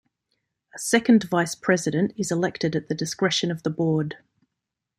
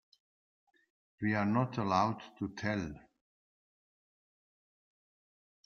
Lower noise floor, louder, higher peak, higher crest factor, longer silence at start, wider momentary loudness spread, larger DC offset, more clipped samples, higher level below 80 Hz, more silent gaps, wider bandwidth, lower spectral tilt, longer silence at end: second, -84 dBFS vs under -90 dBFS; first, -23 LUFS vs -34 LUFS; first, -4 dBFS vs -16 dBFS; about the same, 22 dB vs 24 dB; second, 0.75 s vs 1.2 s; about the same, 9 LU vs 11 LU; neither; neither; about the same, -64 dBFS vs -68 dBFS; neither; first, 16 kHz vs 6.8 kHz; second, -4.5 dB/octave vs -7 dB/octave; second, 0.85 s vs 2.65 s